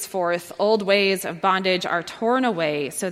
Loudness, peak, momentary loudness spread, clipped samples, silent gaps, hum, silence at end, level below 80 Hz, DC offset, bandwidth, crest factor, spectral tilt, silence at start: -22 LUFS; -4 dBFS; 6 LU; under 0.1%; none; none; 0 s; -68 dBFS; under 0.1%; 16.5 kHz; 18 dB; -4 dB/octave; 0 s